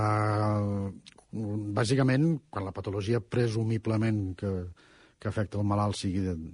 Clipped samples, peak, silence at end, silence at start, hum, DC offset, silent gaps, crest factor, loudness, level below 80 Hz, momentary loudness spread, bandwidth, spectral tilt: under 0.1%; -14 dBFS; 0 s; 0 s; none; under 0.1%; none; 16 dB; -30 LUFS; -56 dBFS; 11 LU; 10.5 kHz; -7 dB/octave